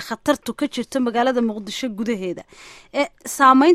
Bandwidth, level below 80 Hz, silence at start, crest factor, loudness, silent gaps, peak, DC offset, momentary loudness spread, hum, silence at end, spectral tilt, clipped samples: 15.5 kHz; -58 dBFS; 0 s; 18 dB; -21 LUFS; none; -2 dBFS; under 0.1%; 13 LU; none; 0 s; -4 dB/octave; under 0.1%